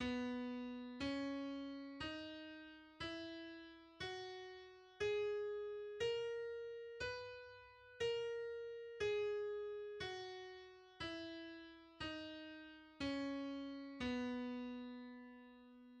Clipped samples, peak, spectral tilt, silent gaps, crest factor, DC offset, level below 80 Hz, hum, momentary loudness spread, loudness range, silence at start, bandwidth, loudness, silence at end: under 0.1%; -32 dBFS; -5 dB/octave; none; 16 dB; under 0.1%; -72 dBFS; none; 16 LU; 5 LU; 0 s; 10 kHz; -47 LUFS; 0 s